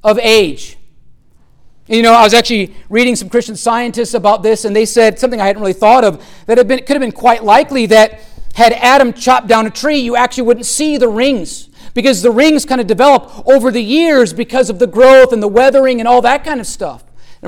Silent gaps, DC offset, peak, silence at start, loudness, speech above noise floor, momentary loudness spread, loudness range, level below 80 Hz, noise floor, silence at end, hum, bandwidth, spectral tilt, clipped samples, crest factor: none; under 0.1%; 0 dBFS; 0.05 s; -10 LUFS; 34 dB; 8 LU; 3 LU; -38 dBFS; -44 dBFS; 0 s; none; 17.5 kHz; -3.5 dB/octave; under 0.1%; 10 dB